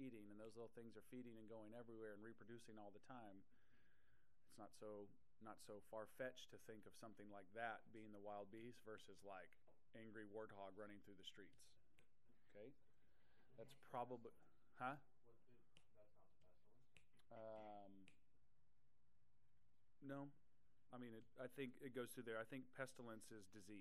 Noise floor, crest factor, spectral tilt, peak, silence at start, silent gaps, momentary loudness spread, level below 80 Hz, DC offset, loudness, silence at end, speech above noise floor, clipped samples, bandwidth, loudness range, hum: -86 dBFS; 24 dB; -5 dB/octave; -36 dBFS; 0 s; none; 12 LU; -88 dBFS; under 0.1%; -59 LUFS; 0 s; 28 dB; under 0.1%; 13 kHz; 9 LU; none